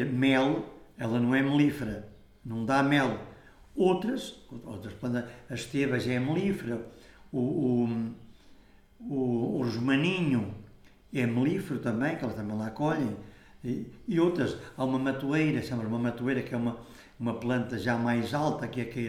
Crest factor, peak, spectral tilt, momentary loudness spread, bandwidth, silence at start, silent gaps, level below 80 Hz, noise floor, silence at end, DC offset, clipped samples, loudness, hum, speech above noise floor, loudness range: 18 dB; -12 dBFS; -7 dB/octave; 14 LU; 14.5 kHz; 0 s; none; -58 dBFS; -56 dBFS; 0 s; under 0.1%; under 0.1%; -30 LUFS; none; 27 dB; 3 LU